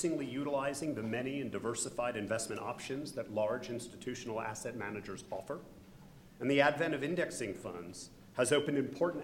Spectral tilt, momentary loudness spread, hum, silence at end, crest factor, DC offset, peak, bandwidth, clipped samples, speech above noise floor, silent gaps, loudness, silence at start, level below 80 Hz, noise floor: -4.5 dB/octave; 14 LU; none; 0 s; 24 dB; under 0.1%; -14 dBFS; 17 kHz; under 0.1%; 20 dB; none; -36 LUFS; 0 s; -66 dBFS; -56 dBFS